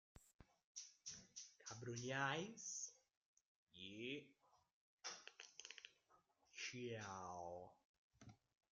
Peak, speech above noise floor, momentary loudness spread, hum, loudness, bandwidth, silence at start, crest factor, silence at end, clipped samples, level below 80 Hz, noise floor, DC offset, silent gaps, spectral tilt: -30 dBFS; 29 dB; 18 LU; none; -52 LUFS; 9.6 kHz; 0.15 s; 26 dB; 0.35 s; under 0.1%; -84 dBFS; -79 dBFS; under 0.1%; 0.34-0.39 s, 0.64-0.75 s, 3.17-3.67 s, 4.72-4.98 s, 7.85-8.10 s; -3 dB/octave